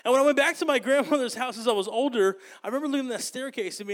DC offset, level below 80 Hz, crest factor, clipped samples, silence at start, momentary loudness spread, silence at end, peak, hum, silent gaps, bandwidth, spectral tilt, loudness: under 0.1%; -80 dBFS; 16 dB; under 0.1%; 0.05 s; 11 LU; 0 s; -10 dBFS; none; none; 17.5 kHz; -3 dB/octave; -25 LUFS